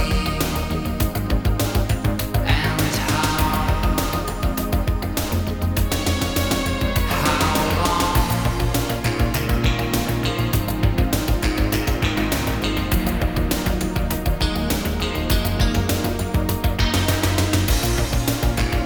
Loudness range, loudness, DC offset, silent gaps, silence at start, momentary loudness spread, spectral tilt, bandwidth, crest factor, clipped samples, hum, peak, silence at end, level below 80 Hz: 2 LU; -21 LUFS; under 0.1%; none; 0 s; 4 LU; -5 dB/octave; over 20 kHz; 16 dB; under 0.1%; none; -4 dBFS; 0 s; -26 dBFS